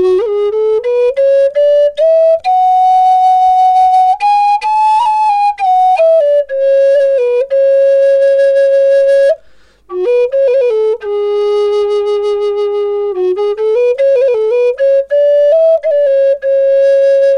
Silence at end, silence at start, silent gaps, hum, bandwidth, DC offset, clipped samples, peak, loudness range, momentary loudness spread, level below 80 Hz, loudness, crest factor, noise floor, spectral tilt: 0 s; 0 s; none; none; 9.8 kHz; under 0.1%; under 0.1%; -4 dBFS; 4 LU; 6 LU; -52 dBFS; -10 LUFS; 6 dB; -44 dBFS; -3.5 dB/octave